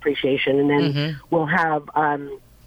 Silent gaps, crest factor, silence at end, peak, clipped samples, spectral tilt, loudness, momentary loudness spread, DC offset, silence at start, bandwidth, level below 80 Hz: none; 14 dB; 0.3 s; -6 dBFS; under 0.1%; -7.5 dB/octave; -21 LUFS; 7 LU; under 0.1%; 0 s; 8.2 kHz; -56 dBFS